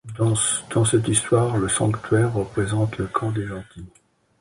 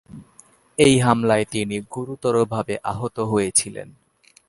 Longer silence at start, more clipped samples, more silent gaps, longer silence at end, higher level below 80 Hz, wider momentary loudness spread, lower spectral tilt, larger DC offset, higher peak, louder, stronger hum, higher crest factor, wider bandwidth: about the same, 0.05 s vs 0.15 s; neither; neither; about the same, 0.55 s vs 0.6 s; first, -46 dBFS vs -52 dBFS; second, 8 LU vs 15 LU; about the same, -5 dB/octave vs -4.5 dB/octave; neither; second, -6 dBFS vs 0 dBFS; about the same, -21 LUFS vs -20 LUFS; neither; about the same, 18 dB vs 22 dB; about the same, 11.5 kHz vs 11.5 kHz